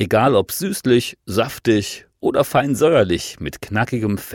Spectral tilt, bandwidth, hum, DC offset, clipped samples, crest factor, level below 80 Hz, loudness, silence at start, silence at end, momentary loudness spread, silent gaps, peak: -5.5 dB/octave; 18 kHz; none; under 0.1%; under 0.1%; 14 dB; -46 dBFS; -18 LUFS; 0 s; 0 s; 9 LU; none; -4 dBFS